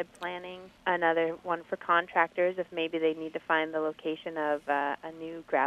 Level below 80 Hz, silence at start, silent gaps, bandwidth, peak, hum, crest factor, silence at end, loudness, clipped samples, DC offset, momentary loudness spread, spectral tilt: -72 dBFS; 0 s; none; 10 kHz; -10 dBFS; none; 22 dB; 0 s; -30 LUFS; under 0.1%; under 0.1%; 11 LU; -5.5 dB/octave